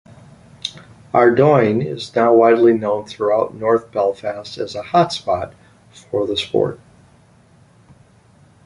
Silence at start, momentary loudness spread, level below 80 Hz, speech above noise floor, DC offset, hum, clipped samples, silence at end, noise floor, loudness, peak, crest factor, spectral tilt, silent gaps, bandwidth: 0.65 s; 15 LU; -54 dBFS; 34 dB; under 0.1%; none; under 0.1%; 1.9 s; -50 dBFS; -17 LUFS; -2 dBFS; 16 dB; -6.5 dB/octave; none; 11 kHz